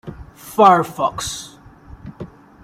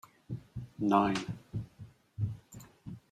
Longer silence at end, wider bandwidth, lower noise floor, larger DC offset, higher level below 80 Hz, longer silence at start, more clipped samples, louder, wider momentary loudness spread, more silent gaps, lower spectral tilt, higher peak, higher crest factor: first, 0.35 s vs 0.15 s; first, 16 kHz vs 14.5 kHz; second, -42 dBFS vs -54 dBFS; neither; first, -46 dBFS vs -60 dBFS; second, 0.05 s vs 0.3 s; neither; first, -16 LUFS vs -34 LUFS; first, 26 LU vs 22 LU; neither; second, -4.5 dB/octave vs -6.5 dB/octave; first, -2 dBFS vs -12 dBFS; about the same, 18 dB vs 22 dB